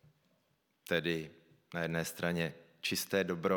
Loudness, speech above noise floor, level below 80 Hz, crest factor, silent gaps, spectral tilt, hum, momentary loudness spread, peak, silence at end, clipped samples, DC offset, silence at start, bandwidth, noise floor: -36 LUFS; 42 dB; -70 dBFS; 20 dB; none; -4.5 dB/octave; none; 9 LU; -16 dBFS; 0 s; under 0.1%; under 0.1%; 0.9 s; 19 kHz; -77 dBFS